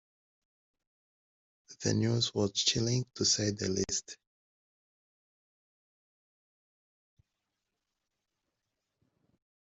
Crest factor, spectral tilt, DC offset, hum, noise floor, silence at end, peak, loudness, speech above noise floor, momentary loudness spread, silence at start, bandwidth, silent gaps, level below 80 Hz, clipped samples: 24 dB; -3.5 dB/octave; under 0.1%; none; -86 dBFS; 5.45 s; -12 dBFS; -30 LUFS; 55 dB; 7 LU; 1.7 s; 8.2 kHz; none; -66 dBFS; under 0.1%